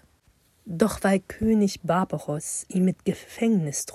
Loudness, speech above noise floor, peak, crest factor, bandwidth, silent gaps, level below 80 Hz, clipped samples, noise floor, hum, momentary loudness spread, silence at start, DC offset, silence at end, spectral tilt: -25 LUFS; 38 dB; -6 dBFS; 20 dB; 14.5 kHz; none; -50 dBFS; under 0.1%; -63 dBFS; none; 8 LU; 0.65 s; under 0.1%; 0 s; -5.5 dB/octave